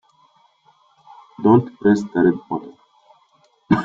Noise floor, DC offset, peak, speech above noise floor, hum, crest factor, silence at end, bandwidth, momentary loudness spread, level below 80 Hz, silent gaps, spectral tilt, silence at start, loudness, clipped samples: -59 dBFS; under 0.1%; -2 dBFS; 42 dB; none; 18 dB; 0 s; 7.6 kHz; 12 LU; -56 dBFS; none; -8.5 dB/octave; 1.4 s; -18 LUFS; under 0.1%